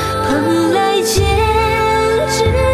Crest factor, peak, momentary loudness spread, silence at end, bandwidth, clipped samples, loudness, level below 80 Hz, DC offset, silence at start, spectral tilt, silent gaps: 10 dB; -2 dBFS; 1 LU; 0 s; 14 kHz; under 0.1%; -14 LUFS; -24 dBFS; under 0.1%; 0 s; -5 dB/octave; none